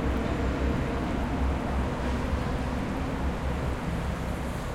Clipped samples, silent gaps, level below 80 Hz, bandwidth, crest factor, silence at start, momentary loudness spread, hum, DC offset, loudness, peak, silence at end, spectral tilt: under 0.1%; none; -32 dBFS; 14 kHz; 12 dB; 0 s; 3 LU; none; under 0.1%; -30 LUFS; -16 dBFS; 0 s; -7 dB/octave